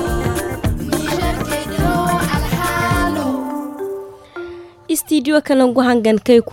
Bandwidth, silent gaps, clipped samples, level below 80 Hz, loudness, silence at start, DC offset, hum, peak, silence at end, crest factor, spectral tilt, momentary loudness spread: 17 kHz; none; under 0.1%; -30 dBFS; -17 LUFS; 0 s; under 0.1%; none; 0 dBFS; 0 s; 16 dB; -5.5 dB/octave; 17 LU